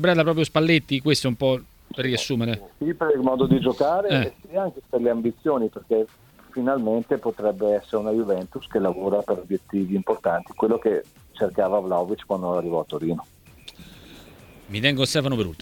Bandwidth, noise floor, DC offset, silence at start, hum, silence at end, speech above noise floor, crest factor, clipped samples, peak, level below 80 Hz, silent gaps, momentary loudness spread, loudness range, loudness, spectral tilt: 19 kHz; -47 dBFS; under 0.1%; 0 s; none; 0.05 s; 24 dB; 20 dB; under 0.1%; -2 dBFS; -54 dBFS; none; 8 LU; 4 LU; -24 LUFS; -6 dB/octave